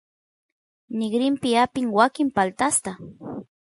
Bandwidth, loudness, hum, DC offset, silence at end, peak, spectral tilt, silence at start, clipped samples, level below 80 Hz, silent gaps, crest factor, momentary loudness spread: 11.5 kHz; -22 LUFS; none; under 0.1%; 0.2 s; -4 dBFS; -3.5 dB/octave; 0.9 s; under 0.1%; -62 dBFS; none; 20 dB; 16 LU